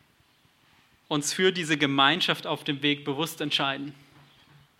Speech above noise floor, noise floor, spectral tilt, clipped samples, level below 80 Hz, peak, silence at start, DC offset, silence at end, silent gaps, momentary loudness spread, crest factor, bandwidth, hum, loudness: 37 dB; -63 dBFS; -3.5 dB/octave; under 0.1%; -76 dBFS; -6 dBFS; 1.1 s; under 0.1%; 0.85 s; none; 10 LU; 22 dB; 16 kHz; none; -25 LUFS